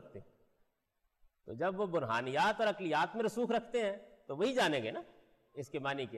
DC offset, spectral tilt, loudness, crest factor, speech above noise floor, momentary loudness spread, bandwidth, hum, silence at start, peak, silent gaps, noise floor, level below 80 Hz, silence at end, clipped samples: under 0.1%; -5 dB/octave; -35 LUFS; 14 dB; 47 dB; 17 LU; 13 kHz; none; 0 s; -22 dBFS; none; -81 dBFS; -74 dBFS; 0 s; under 0.1%